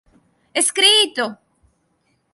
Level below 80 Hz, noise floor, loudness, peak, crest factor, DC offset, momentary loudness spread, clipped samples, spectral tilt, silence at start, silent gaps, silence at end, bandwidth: -68 dBFS; -66 dBFS; -15 LUFS; -2 dBFS; 20 dB; under 0.1%; 14 LU; under 0.1%; 1 dB/octave; 0.55 s; none; 1 s; 12 kHz